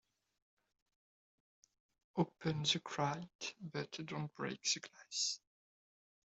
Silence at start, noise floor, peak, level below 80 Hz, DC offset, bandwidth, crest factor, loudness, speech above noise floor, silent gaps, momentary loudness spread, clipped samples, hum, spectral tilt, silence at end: 2.15 s; under -90 dBFS; -20 dBFS; -78 dBFS; under 0.1%; 8.2 kHz; 24 dB; -40 LUFS; over 49 dB; 3.35-3.39 s; 10 LU; under 0.1%; none; -3.5 dB/octave; 0.95 s